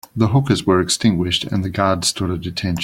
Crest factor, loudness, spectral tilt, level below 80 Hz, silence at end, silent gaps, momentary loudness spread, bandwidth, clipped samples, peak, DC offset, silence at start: 16 dB; -18 LUFS; -5 dB/octave; -46 dBFS; 0 s; none; 7 LU; 16.5 kHz; under 0.1%; -2 dBFS; under 0.1%; 0.15 s